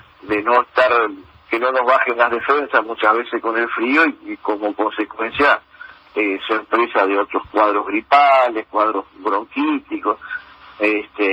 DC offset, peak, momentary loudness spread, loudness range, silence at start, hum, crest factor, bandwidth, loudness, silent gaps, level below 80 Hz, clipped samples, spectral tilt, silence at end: under 0.1%; 0 dBFS; 8 LU; 2 LU; 0.25 s; none; 18 dB; 8.6 kHz; -18 LUFS; none; -58 dBFS; under 0.1%; -5 dB/octave; 0 s